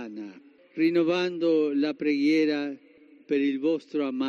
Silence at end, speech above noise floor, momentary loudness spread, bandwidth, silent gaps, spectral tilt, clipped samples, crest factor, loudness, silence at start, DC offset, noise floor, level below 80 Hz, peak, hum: 0 s; 24 dB; 17 LU; 7 kHz; none; -6 dB/octave; under 0.1%; 12 dB; -26 LUFS; 0 s; under 0.1%; -49 dBFS; -80 dBFS; -14 dBFS; none